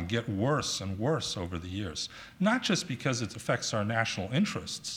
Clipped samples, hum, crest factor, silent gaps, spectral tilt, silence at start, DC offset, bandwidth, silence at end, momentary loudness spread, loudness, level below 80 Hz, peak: under 0.1%; none; 20 dB; none; -4.5 dB/octave; 0 s; under 0.1%; 16 kHz; 0 s; 8 LU; -31 LUFS; -58 dBFS; -12 dBFS